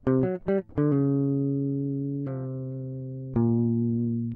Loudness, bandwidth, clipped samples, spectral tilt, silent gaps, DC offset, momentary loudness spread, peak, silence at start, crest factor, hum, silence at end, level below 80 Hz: -27 LUFS; 3.1 kHz; under 0.1%; -13 dB/octave; none; under 0.1%; 10 LU; -12 dBFS; 0.05 s; 14 dB; none; 0 s; -54 dBFS